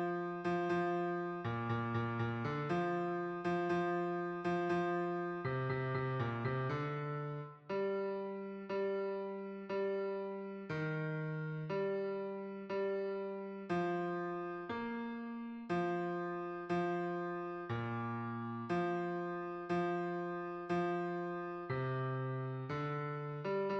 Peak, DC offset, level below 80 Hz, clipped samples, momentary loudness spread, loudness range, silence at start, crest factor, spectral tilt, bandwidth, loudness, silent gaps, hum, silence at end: -26 dBFS; under 0.1%; -72 dBFS; under 0.1%; 7 LU; 3 LU; 0 s; 12 dB; -8.5 dB/octave; 7.6 kHz; -39 LUFS; none; none; 0 s